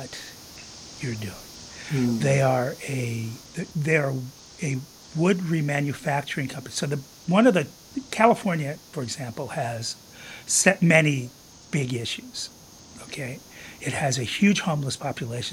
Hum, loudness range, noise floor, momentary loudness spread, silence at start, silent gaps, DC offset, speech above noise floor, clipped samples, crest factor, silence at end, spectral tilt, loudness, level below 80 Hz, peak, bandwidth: none; 3 LU; -46 dBFS; 19 LU; 0 s; none; under 0.1%; 21 dB; under 0.1%; 24 dB; 0 s; -4.5 dB/octave; -25 LUFS; -60 dBFS; -2 dBFS; 16.5 kHz